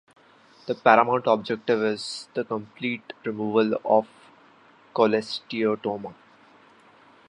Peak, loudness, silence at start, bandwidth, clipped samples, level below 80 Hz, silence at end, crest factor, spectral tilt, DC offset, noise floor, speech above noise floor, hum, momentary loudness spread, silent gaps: -2 dBFS; -24 LUFS; 0.65 s; 11 kHz; under 0.1%; -72 dBFS; 1.15 s; 24 dB; -5.5 dB/octave; under 0.1%; -55 dBFS; 31 dB; none; 14 LU; none